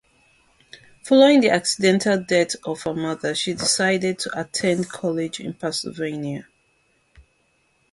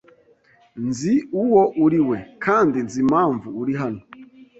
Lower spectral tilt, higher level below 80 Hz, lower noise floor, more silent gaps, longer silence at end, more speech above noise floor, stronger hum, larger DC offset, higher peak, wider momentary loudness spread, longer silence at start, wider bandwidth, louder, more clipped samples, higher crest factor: second, -4 dB/octave vs -7 dB/octave; about the same, -60 dBFS vs -58 dBFS; first, -65 dBFS vs -56 dBFS; neither; first, 1.5 s vs 0.15 s; first, 44 dB vs 37 dB; neither; neither; about the same, -4 dBFS vs -4 dBFS; first, 13 LU vs 10 LU; first, 1.05 s vs 0.75 s; first, 11.5 kHz vs 8.2 kHz; about the same, -21 LUFS vs -20 LUFS; neither; about the same, 20 dB vs 16 dB